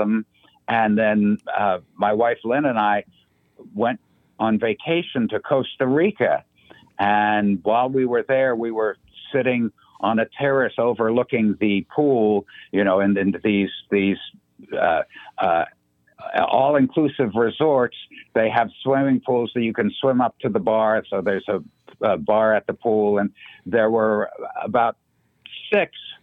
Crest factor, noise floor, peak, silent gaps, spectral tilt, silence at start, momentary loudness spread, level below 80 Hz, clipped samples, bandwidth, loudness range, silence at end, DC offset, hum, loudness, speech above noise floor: 18 dB; -52 dBFS; -4 dBFS; none; -9 dB/octave; 0 s; 8 LU; -64 dBFS; under 0.1%; 4.1 kHz; 2 LU; 0.1 s; under 0.1%; none; -21 LUFS; 31 dB